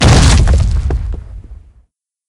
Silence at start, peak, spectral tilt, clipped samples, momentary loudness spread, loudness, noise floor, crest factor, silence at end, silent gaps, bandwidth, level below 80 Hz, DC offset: 0 s; 0 dBFS; -5 dB/octave; 0.2%; 24 LU; -12 LUFS; -54 dBFS; 12 dB; 0.75 s; none; 11.5 kHz; -14 dBFS; under 0.1%